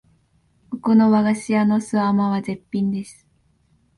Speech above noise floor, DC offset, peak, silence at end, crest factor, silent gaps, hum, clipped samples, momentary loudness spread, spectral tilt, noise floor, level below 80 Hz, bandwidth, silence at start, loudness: 43 dB; under 0.1%; -6 dBFS; 0.85 s; 16 dB; none; none; under 0.1%; 13 LU; -7 dB/octave; -61 dBFS; -60 dBFS; 11.5 kHz; 0.7 s; -20 LUFS